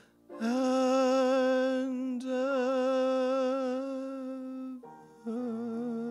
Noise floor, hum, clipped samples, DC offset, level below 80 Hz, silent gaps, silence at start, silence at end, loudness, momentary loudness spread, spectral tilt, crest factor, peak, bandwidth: -50 dBFS; none; under 0.1%; under 0.1%; -82 dBFS; none; 0.3 s; 0 s; -30 LUFS; 14 LU; -4.5 dB/octave; 12 dB; -18 dBFS; 11 kHz